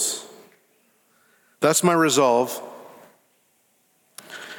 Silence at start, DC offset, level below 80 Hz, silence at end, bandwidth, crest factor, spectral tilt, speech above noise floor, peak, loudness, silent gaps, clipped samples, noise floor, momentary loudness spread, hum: 0 s; under 0.1%; -76 dBFS; 0 s; 19 kHz; 20 dB; -3.5 dB/octave; 46 dB; -6 dBFS; -20 LUFS; none; under 0.1%; -65 dBFS; 24 LU; none